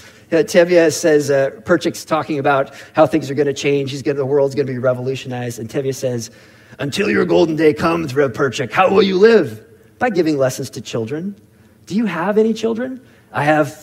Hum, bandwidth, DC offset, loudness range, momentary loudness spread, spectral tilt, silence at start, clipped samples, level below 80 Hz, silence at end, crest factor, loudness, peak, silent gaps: none; 16 kHz; under 0.1%; 5 LU; 12 LU; -5.5 dB/octave; 0.05 s; under 0.1%; -56 dBFS; 0 s; 16 dB; -17 LUFS; 0 dBFS; none